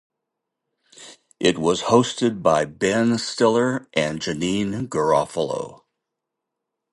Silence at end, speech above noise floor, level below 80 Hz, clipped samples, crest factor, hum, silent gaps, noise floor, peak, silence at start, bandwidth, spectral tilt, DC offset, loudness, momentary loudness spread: 1.2 s; 62 dB; -56 dBFS; under 0.1%; 20 dB; none; none; -82 dBFS; -2 dBFS; 1 s; 11.5 kHz; -4.5 dB/octave; under 0.1%; -21 LUFS; 7 LU